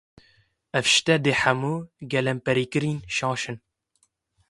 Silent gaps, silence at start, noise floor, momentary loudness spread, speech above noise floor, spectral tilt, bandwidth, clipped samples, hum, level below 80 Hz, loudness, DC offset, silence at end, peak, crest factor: none; 0.75 s; -70 dBFS; 11 LU; 46 dB; -4 dB/octave; 11.5 kHz; under 0.1%; none; -60 dBFS; -23 LUFS; under 0.1%; 0.95 s; -4 dBFS; 22 dB